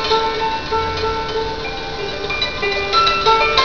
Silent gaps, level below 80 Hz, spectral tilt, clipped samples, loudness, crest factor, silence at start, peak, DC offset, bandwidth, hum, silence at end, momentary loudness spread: none; -36 dBFS; -3.5 dB/octave; under 0.1%; -18 LUFS; 18 dB; 0 s; 0 dBFS; 2%; 5.4 kHz; none; 0 s; 11 LU